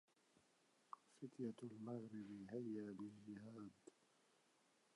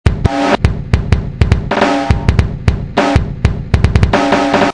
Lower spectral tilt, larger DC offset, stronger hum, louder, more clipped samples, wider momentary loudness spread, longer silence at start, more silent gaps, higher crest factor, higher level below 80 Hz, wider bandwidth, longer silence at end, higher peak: about the same, -7.5 dB/octave vs -6.5 dB/octave; second, under 0.1% vs 0.7%; neither; second, -54 LUFS vs -13 LUFS; second, under 0.1% vs 2%; first, 12 LU vs 5 LU; first, 0.9 s vs 0.05 s; neither; first, 18 dB vs 12 dB; second, under -90 dBFS vs -18 dBFS; about the same, 11 kHz vs 10.5 kHz; first, 1.05 s vs 0 s; second, -38 dBFS vs 0 dBFS